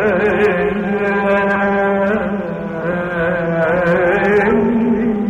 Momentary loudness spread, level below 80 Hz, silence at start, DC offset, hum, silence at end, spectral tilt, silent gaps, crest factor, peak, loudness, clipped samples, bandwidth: 7 LU; -40 dBFS; 0 s; under 0.1%; none; 0 s; -8 dB/octave; none; 12 dB; -4 dBFS; -15 LUFS; under 0.1%; 8.2 kHz